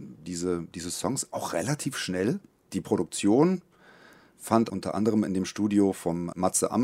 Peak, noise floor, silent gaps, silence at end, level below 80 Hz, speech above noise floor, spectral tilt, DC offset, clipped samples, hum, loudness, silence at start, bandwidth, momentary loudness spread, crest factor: -6 dBFS; -55 dBFS; none; 0 s; -64 dBFS; 28 dB; -5 dB/octave; under 0.1%; under 0.1%; none; -28 LUFS; 0 s; 16 kHz; 10 LU; 22 dB